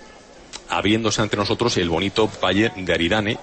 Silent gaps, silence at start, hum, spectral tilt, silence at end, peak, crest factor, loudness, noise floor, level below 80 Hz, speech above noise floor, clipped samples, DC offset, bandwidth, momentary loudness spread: none; 0 s; none; -4.5 dB/octave; 0 s; -6 dBFS; 16 dB; -20 LUFS; -44 dBFS; -44 dBFS; 24 dB; under 0.1%; under 0.1%; 8.8 kHz; 4 LU